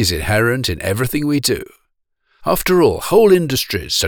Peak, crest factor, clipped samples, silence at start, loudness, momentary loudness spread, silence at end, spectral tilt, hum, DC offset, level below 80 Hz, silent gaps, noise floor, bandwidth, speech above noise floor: -2 dBFS; 14 dB; under 0.1%; 0 s; -16 LUFS; 8 LU; 0 s; -4.5 dB/octave; none; under 0.1%; -36 dBFS; none; -67 dBFS; over 20 kHz; 51 dB